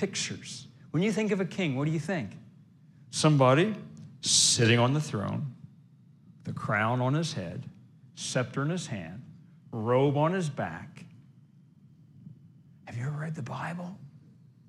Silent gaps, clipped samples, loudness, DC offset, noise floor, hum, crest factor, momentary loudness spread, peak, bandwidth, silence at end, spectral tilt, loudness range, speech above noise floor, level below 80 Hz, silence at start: none; under 0.1%; -28 LUFS; under 0.1%; -57 dBFS; none; 20 dB; 21 LU; -10 dBFS; 14 kHz; 0.5 s; -4.5 dB/octave; 14 LU; 29 dB; -72 dBFS; 0 s